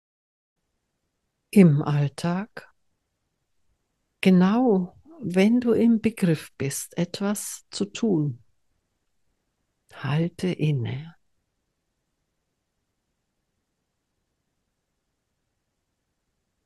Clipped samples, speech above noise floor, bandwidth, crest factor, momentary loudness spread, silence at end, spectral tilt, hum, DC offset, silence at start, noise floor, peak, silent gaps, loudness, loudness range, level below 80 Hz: under 0.1%; 56 dB; 12.5 kHz; 24 dB; 13 LU; 5.55 s; -6.5 dB/octave; none; under 0.1%; 1.55 s; -78 dBFS; -2 dBFS; none; -23 LUFS; 8 LU; -66 dBFS